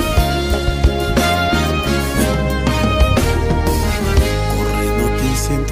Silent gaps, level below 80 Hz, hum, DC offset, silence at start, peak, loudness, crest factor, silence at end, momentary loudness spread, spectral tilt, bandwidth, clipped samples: none; -20 dBFS; none; under 0.1%; 0 s; -2 dBFS; -16 LUFS; 12 dB; 0 s; 3 LU; -5 dB/octave; 16 kHz; under 0.1%